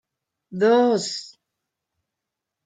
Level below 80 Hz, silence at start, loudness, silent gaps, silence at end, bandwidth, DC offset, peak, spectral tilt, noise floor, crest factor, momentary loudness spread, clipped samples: -78 dBFS; 0.5 s; -20 LUFS; none; 1.4 s; 9.4 kHz; under 0.1%; -8 dBFS; -4.5 dB/octave; -84 dBFS; 18 dB; 16 LU; under 0.1%